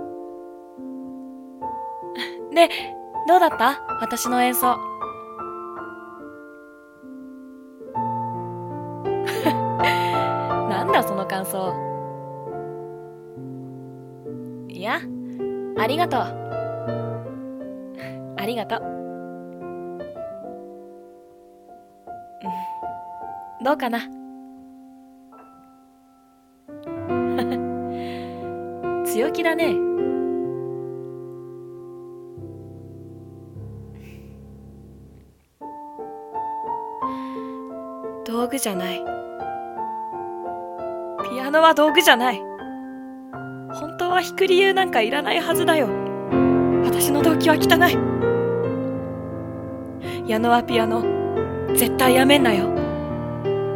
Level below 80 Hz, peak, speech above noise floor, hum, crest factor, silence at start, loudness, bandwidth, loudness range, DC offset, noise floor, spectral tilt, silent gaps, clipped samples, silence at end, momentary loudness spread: -54 dBFS; 0 dBFS; 37 dB; none; 24 dB; 0 s; -22 LUFS; 17.5 kHz; 17 LU; under 0.1%; -55 dBFS; -4.5 dB/octave; none; under 0.1%; 0 s; 22 LU